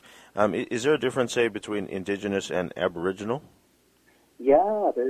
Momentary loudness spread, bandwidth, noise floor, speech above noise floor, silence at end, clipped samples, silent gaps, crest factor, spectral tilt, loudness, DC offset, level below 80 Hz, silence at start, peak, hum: 11 LU; 14.5 kHz; -63 dBFS; 37 dB; 0 s; under 0.1%; none; 20 dB; -5 dB/octave; -26 LUFS; under 0.1%; -60 dBFS; 0.35 s; -6 dBFS; none